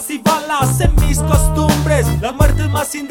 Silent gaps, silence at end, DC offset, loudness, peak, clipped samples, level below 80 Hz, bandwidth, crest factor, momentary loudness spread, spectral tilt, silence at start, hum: none; 0 s; under 0.1%; -15 LUFS; 0 dBFS; under 0.1%; -18 dBFS; 18 kHz; 14 dB; 4 LU; -5 dB/octave; 0 s; none